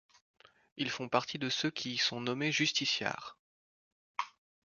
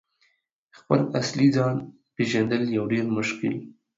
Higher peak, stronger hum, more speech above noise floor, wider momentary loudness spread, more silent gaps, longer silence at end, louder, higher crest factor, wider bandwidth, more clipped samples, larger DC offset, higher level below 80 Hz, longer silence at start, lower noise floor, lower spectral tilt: second, -12 dBFS vs -6 dBFS; neither; first, over 56 dB vs 46 dB; first, 15 LU vs 9 LU; first, 3.39-4.15 s vs none; about the same, 0.4 s vs 0.3 s; second, -33 LUFS vs -24 LUFS; about the same, 24 dB vs 20 dB; about the same, 7.4 kHz vs 7.8 kHz; neither; neither; second, -78 dBFS vs -64 dBFS; second, 0.75 s vs 0.9 s; first, under -90 dBFS vs -69 dBFS; second, -3 dB/octave vs -6 dB/octave